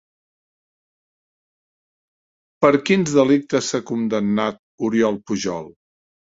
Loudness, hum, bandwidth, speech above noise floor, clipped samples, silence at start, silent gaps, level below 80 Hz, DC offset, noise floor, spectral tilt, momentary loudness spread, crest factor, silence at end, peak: -20 LUFS; none; 8 kHz; over 71 dB; under 0.1%; 2.6 s; 4.59-4.78 s; -60 dBFS; under 0.1%; under -90 dBFS; -5 dB/octave; 10 LU; 22 dB; 0.6 s; 0 dBFS